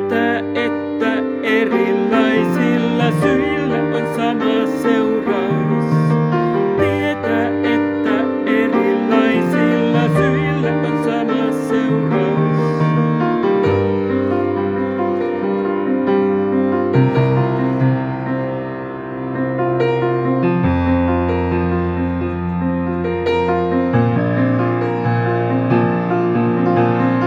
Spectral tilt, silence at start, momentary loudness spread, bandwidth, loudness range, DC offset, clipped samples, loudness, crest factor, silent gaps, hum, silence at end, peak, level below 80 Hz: -8 dB/octave; 0 s; 4 LU; 12.5 kHz; 2 LU; under 0.1%; under 0.1%; -17 LUFS; 14 dB; none; none; 0 s; -2 dBFS; -44 dBFS